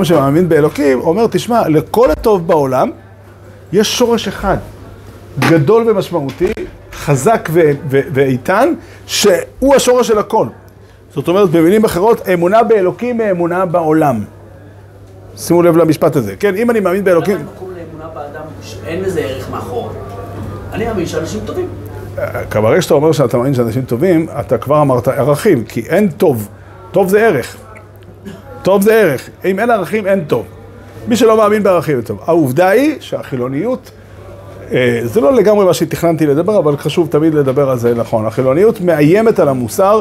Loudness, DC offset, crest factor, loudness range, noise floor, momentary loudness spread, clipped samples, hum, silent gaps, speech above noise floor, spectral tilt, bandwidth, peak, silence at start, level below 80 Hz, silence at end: -12 LUFS; under 0.1%; 12 dB; 5 LU; -39 dBFS; 15 LU; under 0.1%; none; none; 27 dB; -6 dB/octave; 16 kHz; 0 dBFS; 0 s; -40 dBFS; 0 s